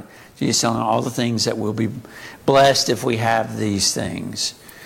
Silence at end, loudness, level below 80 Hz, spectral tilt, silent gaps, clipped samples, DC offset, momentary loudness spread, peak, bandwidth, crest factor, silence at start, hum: 0 s; -19 LUFS; -54 dBFS; -3.5 dB/octave; none; under 0.1%; under 0.1%; 11 LU; -2 dBFS; 17 kHz; 18 dB; 0 s; none